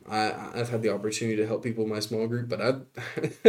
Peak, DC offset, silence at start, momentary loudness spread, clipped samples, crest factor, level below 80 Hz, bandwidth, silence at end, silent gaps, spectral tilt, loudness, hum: -4 dBFS; under 0.1%; 0.05 s; 5 LU; under 0.1%; 24 dB; -70 dBFS; 16 kHz; 0 s; none; -5.5 dB/octave; -29 LUFS; none